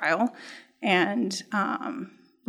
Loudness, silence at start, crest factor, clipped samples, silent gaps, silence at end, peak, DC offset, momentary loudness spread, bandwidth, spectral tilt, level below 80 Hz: -27 LUFS; 0 s; 18 dB; under 0.1%; none; 0.4 s; -10 dBFS; under 0.1%; 20 LU; 13.5 kHz; -4.5 dB/octave; -88 dBFS